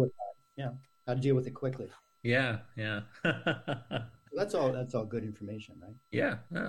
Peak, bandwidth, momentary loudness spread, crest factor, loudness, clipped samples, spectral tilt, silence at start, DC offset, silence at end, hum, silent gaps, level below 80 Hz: -16 dBFS; 12 kHz; 14 LU; 18 dB; -34 LUFS; under 0.1%; -7 dB/octave; 0 s; under 0.1%; 0 s; none; none; -66 dBFS